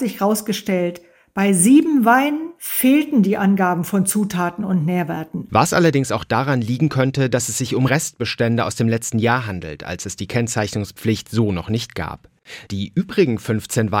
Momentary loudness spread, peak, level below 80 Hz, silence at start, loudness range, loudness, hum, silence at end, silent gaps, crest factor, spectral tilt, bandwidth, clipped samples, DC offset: 12 LU; -2 dBFS; -52 dBFS; 0 s; 6 LU; -19 LUFS; none; 0 s; none; 16 dB; -5 dB/octave; 17 kHz; under 0.1%; under 0.1%